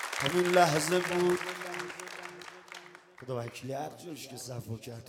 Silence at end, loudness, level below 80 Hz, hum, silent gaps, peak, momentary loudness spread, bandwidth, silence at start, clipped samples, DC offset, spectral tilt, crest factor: 0 s; -31 LUFS; -72 dBFS; none; none; -10 dBFS; 21 LU; 17 kHz; 0 s; under 0.1%; under 0.1%; -4 dB/octave; 22 dB